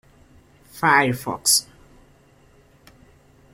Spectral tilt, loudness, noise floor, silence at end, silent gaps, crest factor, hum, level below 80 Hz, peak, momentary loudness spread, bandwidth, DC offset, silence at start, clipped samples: -2 dB/octave; -19 LUFS; -54 dBFS; 1.9 s; none; 22 dB; none; -58 dBFS; -2 dBFS; 6 LU; 16.5 kHz; under 0.1%; 0.75 s; under 0.1%